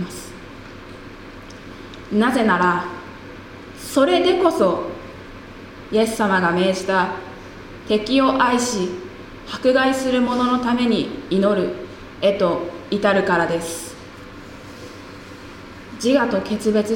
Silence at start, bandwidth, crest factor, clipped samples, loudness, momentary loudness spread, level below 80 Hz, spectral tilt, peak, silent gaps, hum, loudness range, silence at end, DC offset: 0 s; 17 kHz; 18 dB; under 0.1%; -19 LUFS; 21 LU; -48 dBFS; -5 dB/octave; -2 dBFS; none; none; 4 LU; 0 s; under 0.1%